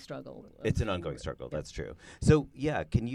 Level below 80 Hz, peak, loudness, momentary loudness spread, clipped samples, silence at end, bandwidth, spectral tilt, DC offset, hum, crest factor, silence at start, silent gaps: -44 dBFS; -8 dBFS; -31 LUFS; 17 LU; under 0.1%; 0 s; 11.5 kHz; -7 dB/octave; under 0.1%; none; 22 dB; 0 s; none